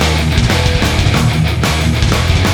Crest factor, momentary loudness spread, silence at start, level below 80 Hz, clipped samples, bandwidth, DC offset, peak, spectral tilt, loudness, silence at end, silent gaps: 12 dB; 1 LU; 0 s; -18 dBFS; under 0.1%; over 20 kHz; under 0.1%; 0 dBFS; -5 dB/octave; -13 LUFS; 0 s; none